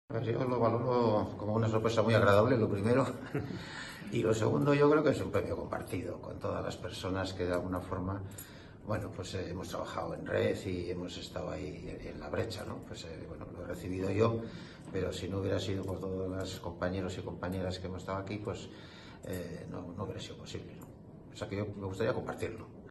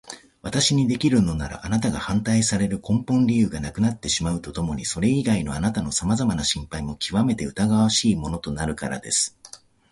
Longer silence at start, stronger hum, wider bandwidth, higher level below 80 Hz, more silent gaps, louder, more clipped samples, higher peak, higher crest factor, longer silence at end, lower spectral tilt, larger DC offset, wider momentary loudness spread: about the same, 0.1 s vs 0.05 s; neither; about the same, 12.5 kHz vs 11.5 kHz; second, -58 dBFS vs -42 dBFS; neither; second, -34 LUFS vs -23 LUFS; neither; second, -12 dBFS vs -8 dBFS; first, 22 dB vs 16 dB; second, 0 s vs 0.35 s; first, -6.5 dB/octave vs -4.5 dB/octave; neither; first, 16 LU vs 9 LU